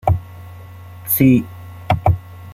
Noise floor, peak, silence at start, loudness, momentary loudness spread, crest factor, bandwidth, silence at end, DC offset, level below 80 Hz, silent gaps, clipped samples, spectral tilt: -36 dBFS; -2 dBFS; 0.05 s; -17 LUFS; 24 LU; 16 dB; 16.5 kHz; 0 s; under 0.1%; -36 dBFS; none; under 0.1%; -7 dB/octave